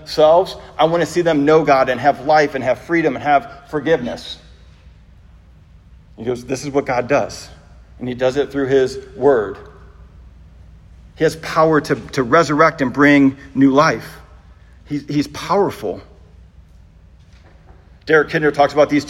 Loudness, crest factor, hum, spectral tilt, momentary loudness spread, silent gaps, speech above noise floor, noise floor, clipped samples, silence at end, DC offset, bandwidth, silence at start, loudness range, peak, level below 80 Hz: -16 LUFS; 18 dB; none; -6 dB/octave; 15 LU; none; 29 dB; -45 dBFS; under 0.1%; 0 s; under 0.1%; 13.5 kHz; 0 s; 9 LU; 0 dBFS; -46 dBFS